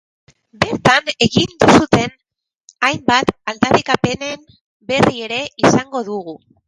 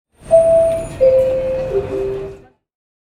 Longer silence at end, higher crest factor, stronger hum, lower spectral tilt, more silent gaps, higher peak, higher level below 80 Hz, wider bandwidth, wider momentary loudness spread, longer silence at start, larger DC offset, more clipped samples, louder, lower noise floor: second, 0.3 s vs 0.8 s; about the same, 16 dB vs 16 dB; neither; second, -4.5 dB/octave vs -6.5 dB/octave; first, 2.57-2.68 s, 4.61-4.80 s vs none; about the same, 0 dBFS vs -2 dBFS; second, -44 dBFS vs -38 dBFS; about the same, 11.5 kHz vs 11 kHz; about the same, 13 LU vs 12 LU; first, 0.6 s vs 0.25 s; neither; neither; about the same, -15 LUFS vs -15 LUFS; first, -78 dBFS vs -36 dBFS